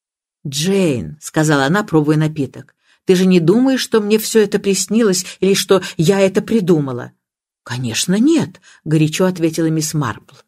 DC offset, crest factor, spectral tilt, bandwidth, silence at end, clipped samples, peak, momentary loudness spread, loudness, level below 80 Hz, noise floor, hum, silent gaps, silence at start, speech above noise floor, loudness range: under 0.1%; 16 dB; -5 dB/octave; 16 kHz; 0.3 s; under 0.1%; 0 dBFS; 11 LU; -15 LUFS; -54 dBFS; -51 dBFS; none; none; 0.45 s; 36 dB; 3 LU